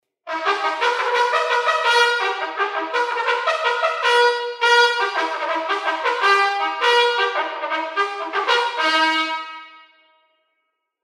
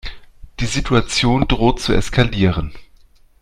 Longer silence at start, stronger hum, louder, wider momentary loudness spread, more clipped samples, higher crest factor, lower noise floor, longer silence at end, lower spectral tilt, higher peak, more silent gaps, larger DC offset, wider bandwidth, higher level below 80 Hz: first, 0.25 s vs 0.05 s; neither; about the same, -19 LUFS vs -17 LUFS; second, 7 LU vs 10 LU; neither; about the same, 18 dB vs 18 dB; first, -74 dBFS vs -48 dBFS; first, 1.25 s vs 0.6 s; second, 1 dB/octave vs -5 dB/octave; second, -4 dBFS vs 0 dBFS; neither; neither; about the same, 14 kHz vs 13 kHz; second, -76 dBFS vs -28 dBFS